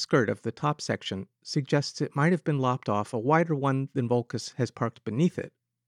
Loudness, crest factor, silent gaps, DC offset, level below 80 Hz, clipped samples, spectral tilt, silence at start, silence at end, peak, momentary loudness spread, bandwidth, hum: -28 LUFS; 18 dB; none; under 0.1%; -76 dBFS; under 0.1%; -6 dB/octave; 0 s; 0.4 s; -10 dBFS; 8 LU; 11 kHz; none